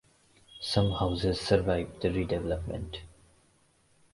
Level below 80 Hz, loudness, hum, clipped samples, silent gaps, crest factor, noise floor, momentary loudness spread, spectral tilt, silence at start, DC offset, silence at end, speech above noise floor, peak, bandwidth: -44 dBFS; -30 LUFS; none; under 0.1%; none; 22 dB; -66 dBFS; 12 LU; -6.5 dB/octave; 0.5 s; under 0.1%; 1.05 s; 37 dB; -8 dBFS; 11.5 kHz